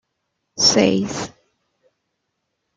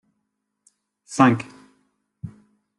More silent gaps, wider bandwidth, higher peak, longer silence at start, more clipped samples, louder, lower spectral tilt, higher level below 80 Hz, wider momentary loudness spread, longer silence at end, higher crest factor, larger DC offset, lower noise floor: neither; about the same, 11 kHz vs 11 kHz; about the same, -2 dBFS vs -2 dBFS; second, 0.55 s vs 1.1 s; neither; first, -17 LUFS vs -20 LUFS; second, -3 dB/octave vs -6 dB/octave; first, -58 dBFS vs -64 dBFS; about the same, 20 LU vs 22 LU; first, 1.5 s vs 0.5 s; about the same, 20 dB vs 24 dB; neither; about the same, -75 dBFS vs -77 dBFS